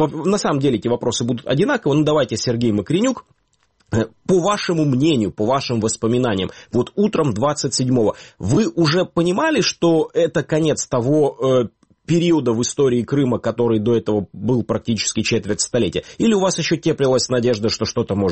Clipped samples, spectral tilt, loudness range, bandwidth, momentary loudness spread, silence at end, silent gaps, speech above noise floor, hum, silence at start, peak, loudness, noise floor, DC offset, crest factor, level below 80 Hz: under 0.1%; -5 dB/octave; 2 LU; 8.8 kHz; 5 LU; 0 s; none; 44 dB; none; 0 s; -6 dBFS; -18 LUFS; -62 dBFS; 0.2%; 14 dB; -50 dBFS